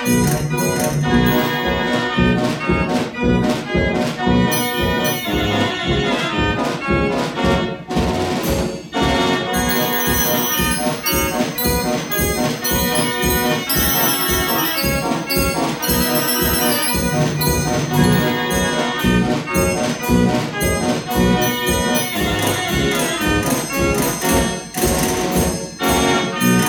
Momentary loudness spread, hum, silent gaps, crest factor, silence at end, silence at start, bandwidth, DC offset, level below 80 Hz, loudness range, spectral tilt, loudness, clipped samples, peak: 4 LU; none; none; 16 dB; 0 s; 0 s; over 20 kHz; under 0.1%; -32 dBFS; 2 LU; -4 dB/octave; -17 LUFS; under 0.1%; -2 dBFS